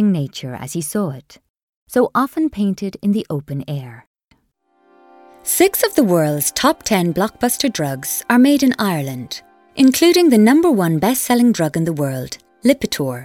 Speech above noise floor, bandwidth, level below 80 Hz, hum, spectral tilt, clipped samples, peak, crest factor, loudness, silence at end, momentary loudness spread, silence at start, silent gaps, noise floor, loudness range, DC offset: 46 dB; 18 kHz; -52 dBFS; none; -5 dB/octave; under 0.1%; 0 dBFS; 16 dB; -16 LUFS; 0 s; 15 LU; 0 s; 1.50-1.54 s, 1.63-1.86 s, 4.07-4.14 s; -62 dBFS; 7 LU; under 0.1%